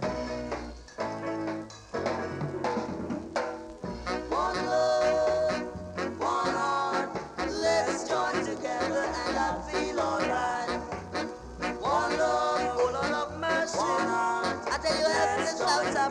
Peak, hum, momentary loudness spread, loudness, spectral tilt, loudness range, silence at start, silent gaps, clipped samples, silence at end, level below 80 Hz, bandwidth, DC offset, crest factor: -14 dBFS; none; 9 LU; -29 LUFS; -4 dB/octave; 6 LU; 0 s; none; under 0.1%; 0 s; -52 dBFS; 11.5 kHz; under 0.1%; 16 dB